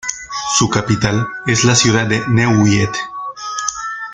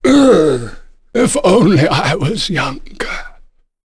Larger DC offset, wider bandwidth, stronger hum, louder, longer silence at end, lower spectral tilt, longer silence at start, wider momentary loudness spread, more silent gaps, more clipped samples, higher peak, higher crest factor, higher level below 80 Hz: neither; second, 9.6 kHz vs 11 kHz; neither; about the same, -15 LUFS vs -13 LUFS; second, 0 s vs 0.5 s; second, -4 dB/octave vs -5.5 dB/octave; about the same, 0.05 s vs 0 s; about the same, 12 LU vs 14 LU; neither; neither; about the same, 0 dBFS vs 0 dBFS; about the same, 16 dB vs 12 dB; second, -44 dBFS vs -34 dBFS